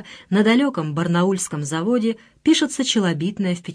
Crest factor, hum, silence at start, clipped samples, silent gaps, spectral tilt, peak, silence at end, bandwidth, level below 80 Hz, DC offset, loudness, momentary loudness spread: 14 dB; none; 0 s; under 0.1%; none; -5 dB/octave; -6 dBFS; 0 s; 11 kHz; -60 dBFS; under 0.1%; -20 LUFS; 7 LU